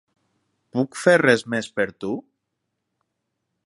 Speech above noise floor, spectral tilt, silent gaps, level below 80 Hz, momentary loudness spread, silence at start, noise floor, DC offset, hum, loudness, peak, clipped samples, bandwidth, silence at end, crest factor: 58 dB; -5 dB/octave; none; -66 dBFS; 14 LU; 0.75 s; -79 dBFS; under 0.1%; none; -21 LUFS; -2 dBFS; under 0.1%; 11.5 kHz; 1.45 s; 22 dB